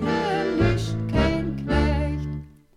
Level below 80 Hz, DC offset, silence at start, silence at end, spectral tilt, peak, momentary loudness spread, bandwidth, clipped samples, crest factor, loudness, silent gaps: -30 dBFS; under 0.1%; 0 s; 0.3 s; -7 dB/octave; -8 dBFS; 8 LU; 11.5 kHz; under 0.1%; 16 dB; -24 LUFS; none